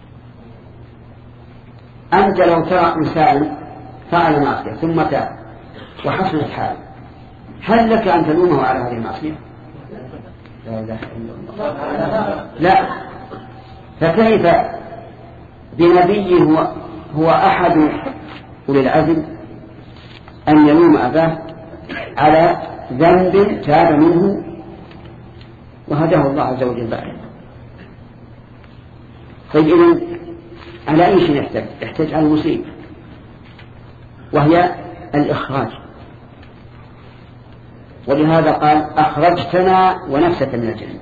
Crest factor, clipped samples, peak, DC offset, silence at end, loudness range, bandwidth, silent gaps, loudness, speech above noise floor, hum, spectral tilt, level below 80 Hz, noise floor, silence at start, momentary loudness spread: 16 dB; under 0.1%; 0 dBFS; under 0.1%; 0 s; 7 LU; 7 kHz; none; -15 LUFS; 26 dB; none; -9 dB/octave; -44 dBFS; -39 dBFS; 0.15 s; 22 LU